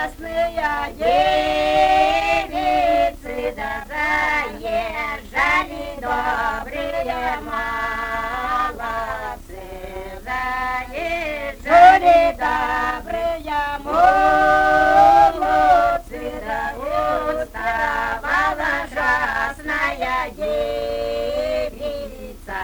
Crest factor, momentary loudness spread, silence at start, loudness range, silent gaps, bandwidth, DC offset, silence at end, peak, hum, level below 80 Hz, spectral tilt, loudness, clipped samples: 18 dB; 13 LU; 0 s; 9 LU; none; over 20 kHz; under 0.1%; 0 s; 0 dBFS; none; -38 dBFS; -4 dB/octave; -19 LUFS; under 0.1%